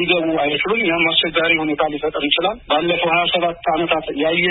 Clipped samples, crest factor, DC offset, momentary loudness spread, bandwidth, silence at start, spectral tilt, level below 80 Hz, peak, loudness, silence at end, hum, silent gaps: under 0.1%; 18 dB; under 0.1%; 5 LU; 4.1 kHz; 0 s; -9.5 dB/octave; -48 dBFS; 0 dBFS; -17 LUFS; 0 s; none; none